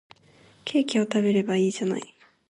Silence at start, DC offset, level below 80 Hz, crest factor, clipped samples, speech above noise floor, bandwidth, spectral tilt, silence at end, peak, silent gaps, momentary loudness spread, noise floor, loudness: 0.65 s; under 0.1%; -72 dBFS; 14 dB; under 0.1%; 33 dB; 10.5 kHz; -5.5 dB/octave; 0.45 s; -12 dBFS; none; 12 LU; -56 dBFS; -25 LUFS